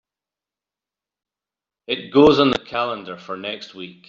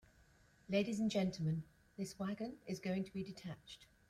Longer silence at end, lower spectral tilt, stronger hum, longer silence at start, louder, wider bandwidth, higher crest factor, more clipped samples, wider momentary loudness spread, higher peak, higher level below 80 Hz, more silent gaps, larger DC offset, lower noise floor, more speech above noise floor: about the same, 0.2 s vs 0.25 s; second, -3.5 dB/octave vs -6 dB/octave; first, 50 Hz at -60 dBFS vs none; first, 1.9 s vs 0.7 s; first, -18 LUFS vs -42 LUFS; second, 7.4 kHz vs 14 kHz; about the same, 20 dB vs 18 dB; neither; first, 18 LU vs 13 LU; first, -2 dBFS vs -24 dBFS; first, -54 dBFS vs -70 dBFS; neither; neither; first, -89 dBFS vs -69 dBFS; first, 70 dB vs 28 dB